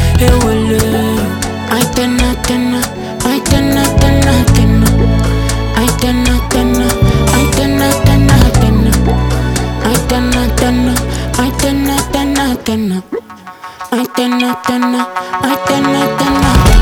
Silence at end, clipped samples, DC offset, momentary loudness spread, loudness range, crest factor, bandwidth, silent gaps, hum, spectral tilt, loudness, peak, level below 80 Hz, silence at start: 0 s; under 0.1%; under 0.1%; 7 LU; 5 LU; 10 dB; 19.5 kHz; none; none; -5 dB/octave; -12 LUFS; 0 dBFS; -18 dBFS; 0 s